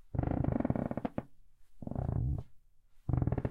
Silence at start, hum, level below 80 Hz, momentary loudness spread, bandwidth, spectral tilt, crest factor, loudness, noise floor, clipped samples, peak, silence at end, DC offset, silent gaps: 0.05 s; none; -44 dBFS; 10 LU; 3.7 kHz; -11.5 dB/octave; 20 dB; -36 LUFS; -59 dBFS; under 0.1%; -16 dBFS; 0 s; under 0.1%; none